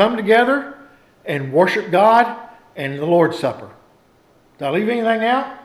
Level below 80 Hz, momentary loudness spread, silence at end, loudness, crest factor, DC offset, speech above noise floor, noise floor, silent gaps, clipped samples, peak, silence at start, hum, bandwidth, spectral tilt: -64 dBFS; 19 LU; 0.05 s; -17 LUFS; 16 dB; under 0.1%; 37 dB; -54 dBFS; none; under 0.1%; -2 dBFS; 0 s; none; 14 kHz; -6.5 dB/octave